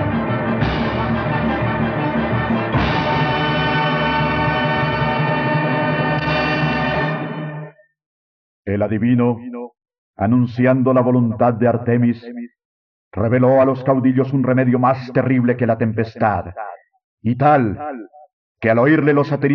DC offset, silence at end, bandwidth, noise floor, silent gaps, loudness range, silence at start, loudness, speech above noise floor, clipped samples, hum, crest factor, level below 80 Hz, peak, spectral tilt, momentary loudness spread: under 0.1%; 0 s; 6.2 kHz; under -90 dBFS; 8.06-8.63 s, 9.98-10.14 s, 12.65-13.11 s, 17.04-17.18 s, 18.33-18.55 s; 4 LU; 0 s; -17 LUFS; over 74 dB; under 0.1%; none; 16 dB; -40 dBFS; -2 dBFS; -5.5 dB/octave; 13 LU